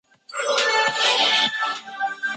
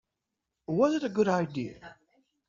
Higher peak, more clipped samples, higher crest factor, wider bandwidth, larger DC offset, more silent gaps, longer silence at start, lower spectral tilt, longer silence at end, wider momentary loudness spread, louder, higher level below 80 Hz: first, -6 dBFS vs -12 dBFS; neither; about the same, 16 dB vs 20 dB; first, 9.6 kHz vs 7.6 kHz; neither; neither; second, 0.3 s vs 0.7 s; second, 0.5 dB/octave vs -6.5 dB/octave; second, 0 s vs 0.55 s; about the same, 11 LU vs 13 LU; first, -20 LUFS vs -28 LUFS; second, -76 dBFS vs -68 dBFS